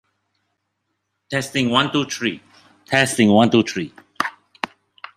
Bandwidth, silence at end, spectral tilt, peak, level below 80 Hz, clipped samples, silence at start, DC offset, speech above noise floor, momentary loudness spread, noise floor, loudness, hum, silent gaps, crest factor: 15 kHz; 0.5 s; -4.5 dB/octave; -2 dBFS; -62 dBFS; under 0.1%; 1.3 s; under 0.1%; 57 dB; 16 LU; -75 dBFS; -19 LUFS; none; none; 20 dB